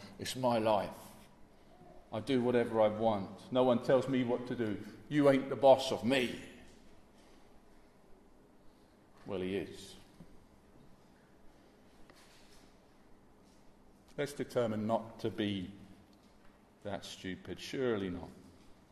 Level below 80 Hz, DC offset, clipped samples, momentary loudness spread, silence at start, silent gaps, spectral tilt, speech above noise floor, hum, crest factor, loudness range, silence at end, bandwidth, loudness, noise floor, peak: -66 dBFS; under 0.1%; under 0.1%; 20 LU; 0 s; none; -6 dB/octave; 29 dB; none; 24 dB; 15 LU; 0.2 s; 13.5 kHz; -34 LUFS; -62 dBFS; -12 dBFS